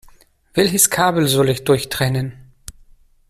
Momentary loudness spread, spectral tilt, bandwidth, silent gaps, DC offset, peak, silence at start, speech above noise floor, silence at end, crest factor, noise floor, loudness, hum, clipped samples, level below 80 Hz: 11 LU; -4 dB/octave; 16 kHz; none; under 0.1%; 0 dBFS; 0.55 s; 32 dB; 0.95 s; 18 dB; -49 dBFS; -16 LUFS; none; under 0.1%; -46 dBFS